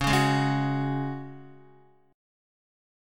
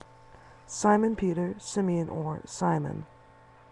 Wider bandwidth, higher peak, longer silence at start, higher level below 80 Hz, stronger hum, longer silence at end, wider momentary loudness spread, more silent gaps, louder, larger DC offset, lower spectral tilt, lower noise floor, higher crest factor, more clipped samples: first, 16.5 kHz vs 11 kHz; about the same, -10 dBFS vs -10 dBFS; second, 0 s vs 0.45 s; first, -48 dBFS vs -58 dBFS; neither; first, 0.95 s vs 0.65 s; first, 20 LU vs 14 LU; neither; first, -26 LUFS vs -29 LUFS; neither; about the same, -5.5 dB/octave vs -6 dB/octave; about the same, -58 dBFS vs -55 dBFS; about the same, 20 dB vs 20 dB; neither